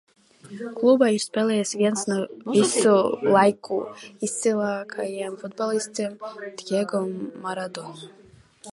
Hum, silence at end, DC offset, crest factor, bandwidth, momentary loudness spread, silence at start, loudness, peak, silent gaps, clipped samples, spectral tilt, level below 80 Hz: none; 0.05 s; under 0.1%; 20 dB; 11.5 kHz; 17 LU; 0.45 s; -23 LUFS; -4 dBFS; none; under 0.1%; -4.5 dB/octave; -72 dBFS